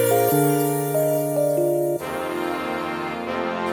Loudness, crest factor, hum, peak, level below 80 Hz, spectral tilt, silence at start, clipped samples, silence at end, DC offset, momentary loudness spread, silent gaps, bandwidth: -22 LUFS; 14 dB; none; -8 dBFS; -60 dBFS; -5.5 dB/octave; 0 s; under 0.1%; 0 s; under 0.1%; 8 LU; none; over 20 kHz